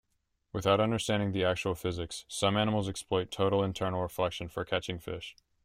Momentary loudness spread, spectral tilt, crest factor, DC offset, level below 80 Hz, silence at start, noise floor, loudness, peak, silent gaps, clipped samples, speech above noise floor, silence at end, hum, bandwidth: 10 LU; -5 dB/octave; 20 dB; under 0.1%; -58 dBFS; 0.55 s; -78 dBFS; -31 LUFS; -12 dBFS; none; under 0.1%; 47 dB; 0.35 s; none; 16 kHz